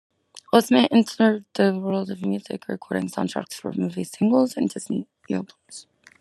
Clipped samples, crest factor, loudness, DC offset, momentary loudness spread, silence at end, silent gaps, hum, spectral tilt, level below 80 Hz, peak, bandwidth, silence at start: under 0.1%; 22 dB; -23 LUFS; under 0.1%; 13 LU; 0.4 s; none; none; -5.5 dB/octave; -74 dBFS; -2 dBFS; 13 kHz; 0.55 s